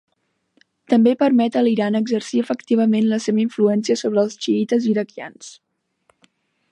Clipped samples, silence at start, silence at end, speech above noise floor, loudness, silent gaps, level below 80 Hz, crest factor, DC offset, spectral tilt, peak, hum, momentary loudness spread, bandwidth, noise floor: under 0.1%; 0.9 s; 1.2 s; 48 dB; -19 LUFS; none; -72 dBFS; 16 dB; under 0.1%; -6 dB/octave; -4 dBFS; none; 9 LU; 9.6 kHz; -66 dBFS